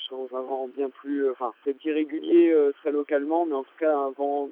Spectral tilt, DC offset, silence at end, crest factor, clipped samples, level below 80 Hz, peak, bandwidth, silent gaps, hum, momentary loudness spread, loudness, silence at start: -7.5 dB/octave; under 0.1%; 0 s; 16 dB; under 0.1%; under -90 dBFS; -10 dBFS; 3.7 kHz; none; none; 11 LU; -25 LUFS; 0 s